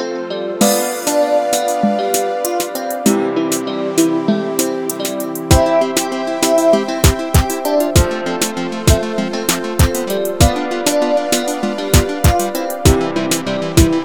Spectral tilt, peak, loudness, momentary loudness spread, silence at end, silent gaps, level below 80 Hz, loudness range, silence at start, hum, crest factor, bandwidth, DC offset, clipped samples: -4.5 dB/octave; 0 dBFS; -16 LUFS; 6 LU; 0 s; none; -24 dBFS; 2 LU; 0 s; none; 16 dB; over 20 kHz; under 0.1%; under 0.1%